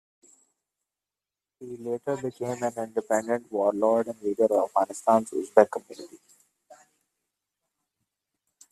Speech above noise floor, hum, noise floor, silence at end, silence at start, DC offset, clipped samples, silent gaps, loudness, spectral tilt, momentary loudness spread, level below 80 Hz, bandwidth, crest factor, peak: over 64 dB; none; under -90 dBFS; 2.55 s; 1.6 s; under 0.1%; under 0.1%; none; -26 LUFS; -5.5 dB/octave; 18 LU; -74 dBFS; 13.5 kHz; 28 dB; -2 dBFS